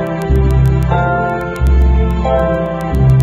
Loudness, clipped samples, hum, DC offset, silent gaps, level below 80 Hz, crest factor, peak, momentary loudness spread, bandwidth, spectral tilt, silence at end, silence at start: -14 LUFS; under 0.1%; none; under 0.1%; none; -16 dBFS; 12 dB; 0 dBFS; 5 LU; 7.6 kHz; -8.5 dB/octave; 0 s; 0 s